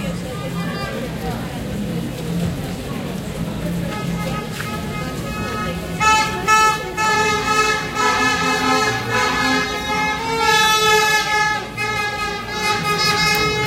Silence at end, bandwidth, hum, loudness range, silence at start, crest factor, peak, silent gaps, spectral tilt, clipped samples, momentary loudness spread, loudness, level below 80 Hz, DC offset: 0 s; 16 kHz; none; 9 LU; 0 s; 16 dB; -2 dBFS; none; -3.5 dB/octave; under 0.1%; 12 LU; -18 LUFS; -38 dBFS; under 0.1%